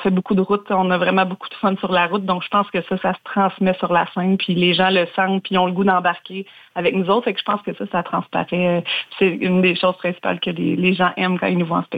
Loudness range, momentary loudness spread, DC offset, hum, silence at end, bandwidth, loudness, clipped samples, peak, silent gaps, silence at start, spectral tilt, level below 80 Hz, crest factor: 2 LU; 6 LU; under 0.1%; none; 0 s; 4.9 kHz; -19 LUFS; under 0.1%; -4 dBFS; none; 0 s; -8 dB/octave; -60 dBFS; 14 dB